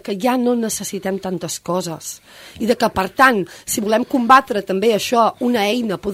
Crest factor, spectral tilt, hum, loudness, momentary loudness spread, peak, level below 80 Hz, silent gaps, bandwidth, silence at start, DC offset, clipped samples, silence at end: 18 dB; -4 dB/octave; none; -18 LUFS; 12 LU; 0 dBFS; -52 dBFS; none; 16 kHz; 0.05 s; under 0.1%; under 0.1%; 0 s